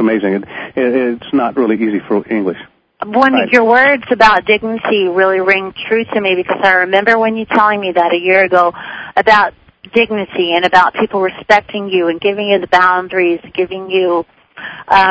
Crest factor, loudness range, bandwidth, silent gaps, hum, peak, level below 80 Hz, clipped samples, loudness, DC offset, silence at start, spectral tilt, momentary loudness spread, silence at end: 12 dB; 3 LU; 8 kHz; none; none; 0 dBFS; -50 dBFS; 0.4%; -12 LUFS; under 0.1%; 0 s; -5.5 dB/octave; 9 LU; 0 s